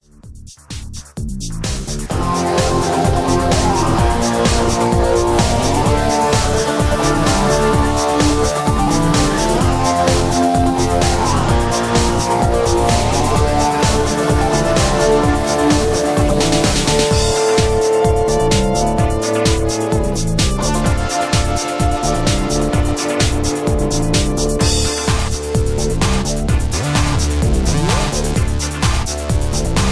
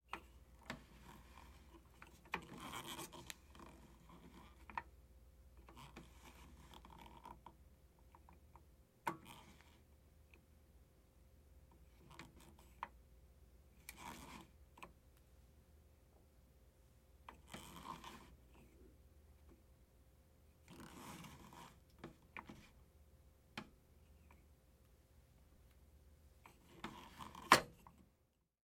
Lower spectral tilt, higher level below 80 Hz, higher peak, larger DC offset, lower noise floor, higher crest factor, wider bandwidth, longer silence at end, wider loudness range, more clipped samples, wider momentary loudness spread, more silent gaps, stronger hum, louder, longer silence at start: first, -4.5 dB/octave vs -3 dB/octave; first, -22 dBFS vs -68 dBFS; first, -2 dBFS vs -10 dBFS; neither; second, -36 dBFS vs -80 dBFS; second, 14 dB vs 42 dB; second, 11 kHz vs 16.5 kHz; second, 0 s vs 0.6 s; second, 3 LU vs 10 LU; neither; second, 4 LU vs 20 LU; neither; neither; first, -15 LUFS vs -46 LUFS; first, 0.25 s vs 0.05 s